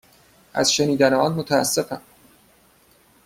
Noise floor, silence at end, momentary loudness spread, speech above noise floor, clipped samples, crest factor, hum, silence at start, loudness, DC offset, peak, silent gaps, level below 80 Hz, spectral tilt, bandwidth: -56 dBFS; 1.3 s; 13 LU; 37 dB; under 0.1%; 20 dB; none; 0.55 s; -20 LUFS; under 0.1%; -4 dBFS; none; -58 dBFS; -3.5 dB/octave; 16.5 kHz